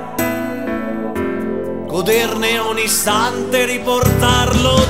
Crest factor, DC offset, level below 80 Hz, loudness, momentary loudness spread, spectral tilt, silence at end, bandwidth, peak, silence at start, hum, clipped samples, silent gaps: 16 dB; 2%; -32 dBFS; -16 LUFS; 9 LU; -4 dB/octave; 0 s; 16.5 kHz; 0 dBFS; 0 s; none; under 0.1%; none